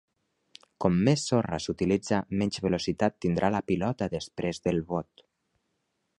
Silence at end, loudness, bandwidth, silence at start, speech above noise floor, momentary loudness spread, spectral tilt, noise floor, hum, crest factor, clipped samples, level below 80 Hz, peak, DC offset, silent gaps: 1.15 s; -28 LUFS; 11 kHz; 0.8 s; 50 dB; 8 LU; -6 dB/octave; -78 dBFS; none; 20 dB; under 0.1%; -52 dBFS; -8 dBFS; under 0.1%; none